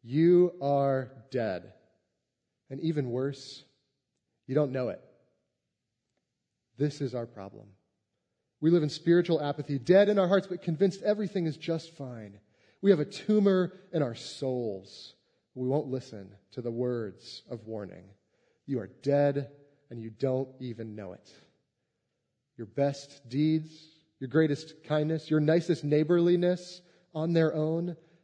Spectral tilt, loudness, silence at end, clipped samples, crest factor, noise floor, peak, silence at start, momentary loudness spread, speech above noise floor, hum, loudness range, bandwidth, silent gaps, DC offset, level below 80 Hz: -7.5 dB/octave; -29 LUFS; 0.3 s; under 0.1%; 20 dB; -84 dBFS; -10 dBFS; 0.05 s; 20 LU; 55 dB; none; 10 LU; 9.6 kHz; none; under 0.1%; -78 dBFS